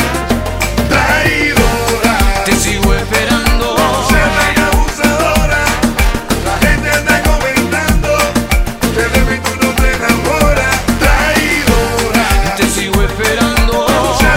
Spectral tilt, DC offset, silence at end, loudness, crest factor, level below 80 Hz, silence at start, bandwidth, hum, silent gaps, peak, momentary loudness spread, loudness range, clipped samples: -4 dB/octave; under 0.1%; 0 s; -12 LUFS; 12 dB; -18 dBFS; 0 s; 16.5 kHz; none; none; 0 dBFS; 4 LU; 1 LU; under 0.1%